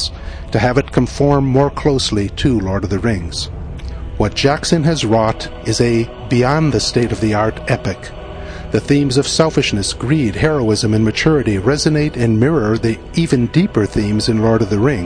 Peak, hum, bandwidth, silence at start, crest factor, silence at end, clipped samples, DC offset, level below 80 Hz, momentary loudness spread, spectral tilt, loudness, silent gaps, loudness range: 0 dBFS; none; 10.5 kHz; 0 s; 16 dB; 0 s; under 0.1%; under 0.1%; -30 dBFS; 9 LU; -5.5 dB/octave; -15 LUFS; none; 2 LU